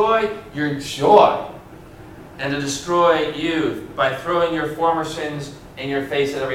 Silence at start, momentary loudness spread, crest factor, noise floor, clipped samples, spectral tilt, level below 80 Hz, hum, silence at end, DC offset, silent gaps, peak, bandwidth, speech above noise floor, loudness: 0 s; 17 LU; 20 dB; -40 dBFS; under 0.1%; -4.5 dB/octave; -50 dBFS; none; 0 s; under 0.1%; none; 0 dBFS; 16 kHz; 21 dB; -19 LUFS